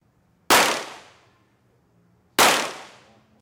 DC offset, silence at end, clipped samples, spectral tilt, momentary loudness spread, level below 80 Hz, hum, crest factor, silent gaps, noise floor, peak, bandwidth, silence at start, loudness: under 0.1%; 0.6 s; under 0.1%; -0.5 dB/octave; 19 LU; -60 dBFS; none; 20 dB; none; -63 dBFS; -4 dBFS; 17.5 kHz; 0.5 s; -19 LUFS